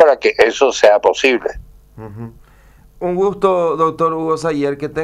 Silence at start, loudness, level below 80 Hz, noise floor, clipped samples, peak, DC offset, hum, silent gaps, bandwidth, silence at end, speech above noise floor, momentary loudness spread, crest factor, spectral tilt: 0 s; -15 LUFS; -44 dBFS; -46 dBFS; under 0.1%; 0 dBFS; under 0.1%; none; none; 13 kHz; 0 s; 31 dB; 20 LU; 16 dB; -4.5 dB/octave